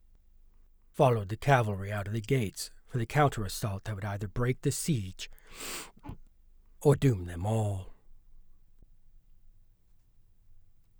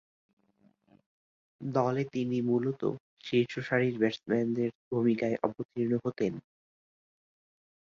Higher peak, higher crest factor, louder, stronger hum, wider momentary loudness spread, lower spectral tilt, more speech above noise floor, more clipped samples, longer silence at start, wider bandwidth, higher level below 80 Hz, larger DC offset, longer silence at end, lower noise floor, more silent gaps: about the same, -10 dBFS vs -12 dBFS; about the same, 22 dB vs 20 dB; about the same, -31 LUFS vs -31 LUFS; neither; first, 16 LU vs 6 LU; second, -6 dB/octave vs -7.5 dB/octave; second, 31 dB vs 38 dB; neither; second, 0.95 s vs 1.6 s; first, over 20 kHz vs 7.2 kHz; first, -50 dBFS vs -72 dBFS; neither; second, 0.4 s vs 1.45 s; second, -61 dBFS vs -68 dBFS; second, none vs 3.00-3.17 s, 4.75-4.91 s, 5.65-5.69 s